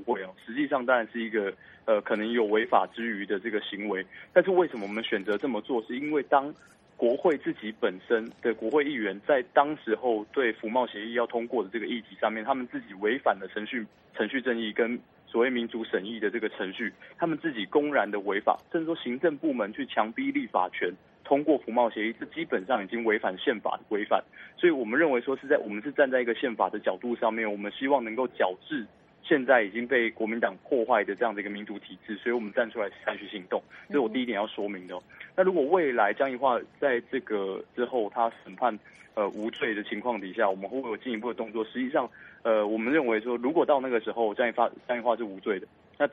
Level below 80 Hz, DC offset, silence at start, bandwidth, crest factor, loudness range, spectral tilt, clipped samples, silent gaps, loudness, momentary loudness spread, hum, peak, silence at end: -74 dBFS; under 0.1%; 0 s; 5.2 kHz; 22 dB; 3 LU; -7 dB/octave; under 0.1%; none; -28 LUFS; 9 LU; none; -6 dBFS; 0 s